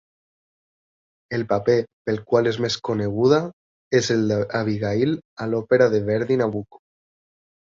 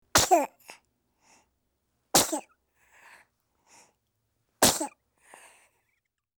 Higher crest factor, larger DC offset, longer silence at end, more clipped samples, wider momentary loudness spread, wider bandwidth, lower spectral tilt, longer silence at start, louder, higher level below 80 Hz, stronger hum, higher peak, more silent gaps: about the same, 20 dB vs 24 dB; neither; second, 1 s vs 1.5 s; neither; second, 9 LU vs 15 LU; second, 7.6 kHz vs over 20 kHz; first, -6 dB/octave vs -1.5 dB/octave; first, 1.3 s vs 0.15 s; first, -22 LUFS vs -25 LUFS; about the same, -56 dBFS vs -56 dBFS; neither; first, -4 dBFS vs -8 dBFS; first, 1.93-2.05 s, 3.53-3.91 s, 5.25-5.37 s vs none